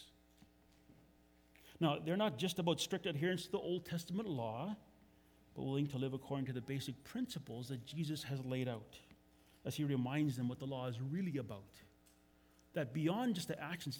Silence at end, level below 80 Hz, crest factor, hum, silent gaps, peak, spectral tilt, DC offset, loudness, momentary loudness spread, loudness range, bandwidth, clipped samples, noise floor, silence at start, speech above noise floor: 0 s; -74 dBFS; 20 dB; none; none; -22 dBFS; -6 dB/octave; under 0.1%; -41 LUFS; 10 LU; 4 LU; over 20 kHz; under 0.1%; -69 dBFS; 0 s; 29 dB